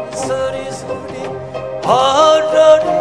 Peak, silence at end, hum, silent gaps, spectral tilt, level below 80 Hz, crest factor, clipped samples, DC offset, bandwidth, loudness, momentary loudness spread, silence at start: 0 dBFS; 0 s; none; none; -4 dB/octave; -48 dBFS; 14 dB; under 0.1%; 0.3%; 11 kHz; -13 LUFS; 16 LU; 0 s